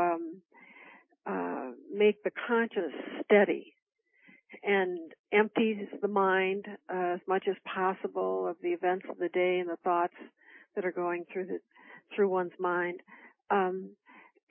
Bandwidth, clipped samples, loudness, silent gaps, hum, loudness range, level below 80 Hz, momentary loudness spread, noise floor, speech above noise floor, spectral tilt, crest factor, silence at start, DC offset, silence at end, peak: 3.6 kHz; under 0.1%; -31 LUFS; 3.82-3.86 s, 5.19-5.24 s; none; 4 LU; -88 dBFS; 13 LU; -62 dBFS; 32 dB; -9.5 dB/octave; 20 dB; 0 s; under 0.1%; 0.3 s; -12 dBFS